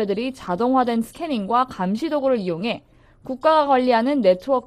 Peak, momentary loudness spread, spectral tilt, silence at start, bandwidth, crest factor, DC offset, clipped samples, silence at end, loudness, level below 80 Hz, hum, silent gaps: -4 dBFS; 9 LU; -6.5 dB/octave; 0 s; 14 kHz; 16 dB; under 0.1%; under 0.1%; 0.05 s; -20 LUFS; -56 dBFS; none; none